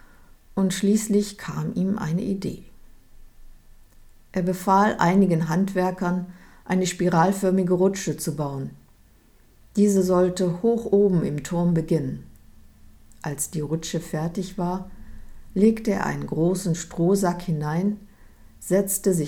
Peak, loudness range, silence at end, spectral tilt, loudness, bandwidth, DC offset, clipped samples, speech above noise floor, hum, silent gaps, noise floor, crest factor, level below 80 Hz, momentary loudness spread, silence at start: -6 dBFS; 6 LU; 0 s; -6 dB/octave; -23 LUFS; 17.5 kHz; under 0.1%; under 0.1%; 32 dB; none; none; -55 dBFS; 18 dB; -48 dBFS; 12 LU; 0.5 s